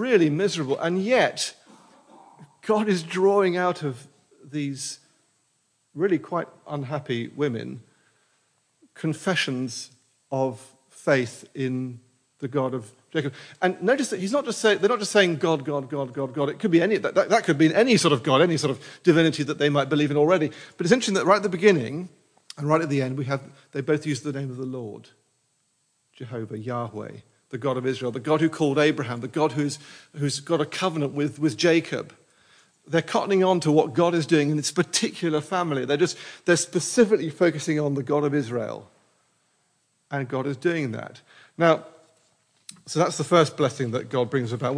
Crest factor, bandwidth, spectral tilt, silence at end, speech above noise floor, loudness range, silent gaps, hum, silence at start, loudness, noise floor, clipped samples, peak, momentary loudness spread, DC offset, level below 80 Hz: 22 dB; 10.5 kHz; -5 dB/octave; 0 s; 47 dB; 9 LU; none; none; 0 s; -24 LUFS; -70 dBFS; under 0.1%; -4 dBFS; 14 LU; under 0.1%; -74 dBFS